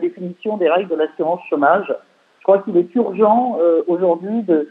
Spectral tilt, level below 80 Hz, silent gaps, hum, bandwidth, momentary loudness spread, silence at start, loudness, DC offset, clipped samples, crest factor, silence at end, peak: -9 dB/octave; -82 dBFS; none; none; 4.1 kHz; 10 LU; 0 s; -17 LUFS; under 0.1%; under 0.1%; 16 dB; 0 s; -2 dBFS